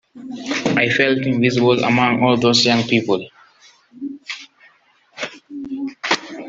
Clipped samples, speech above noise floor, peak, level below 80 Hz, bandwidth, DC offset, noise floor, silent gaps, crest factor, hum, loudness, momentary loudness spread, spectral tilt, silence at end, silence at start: under 0.1%; 39 dB; -2 dBFS; -60 dBFS; 7.8 kHz; under 0.1%; -55 dBFS; none; 18 dB; none; -17 LUFS; 18 LU; -4.5 dB/octave; 0 s; 0.15 s